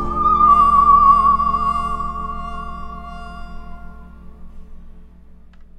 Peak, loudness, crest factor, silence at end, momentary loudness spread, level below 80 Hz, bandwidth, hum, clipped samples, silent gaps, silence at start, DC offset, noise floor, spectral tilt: -2 dBFS; -14 LUFS; 16 dB; 0.15 s; 23 LU; -32 dBFS; 8.8 kHz; none; under 0.1%; none; 0 s; under 0.1%; -42 dBFS; -7 dB/octave